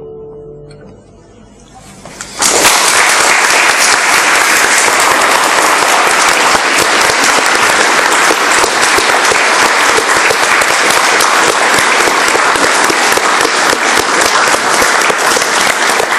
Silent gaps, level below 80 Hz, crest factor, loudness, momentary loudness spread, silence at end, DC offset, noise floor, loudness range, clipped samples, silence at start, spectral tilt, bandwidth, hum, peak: none; -44 dBFS; 10 dB; -7 LUFS; 2 LU; 0 s; under 0.1%; -38 dBFS; 2 LU; 0.2%; 0 s; 0 dB/octave; 19.5 kHz; none; 0 dBFS